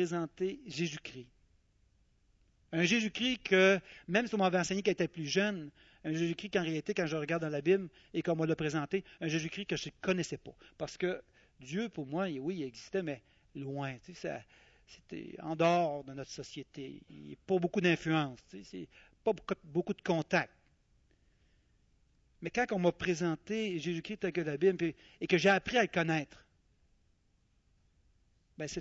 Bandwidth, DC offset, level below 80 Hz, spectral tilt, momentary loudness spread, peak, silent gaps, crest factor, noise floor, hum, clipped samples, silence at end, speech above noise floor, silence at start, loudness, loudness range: 8 kHz; under 0.1%; -66 dBFS; -5 dB/octave; 17 LU; -14 dBFS; none; 22 dB; -72 dBFS; none; under 0.1%; 0 s; 38 dB; 0 s; -34 LUFS; 7 LU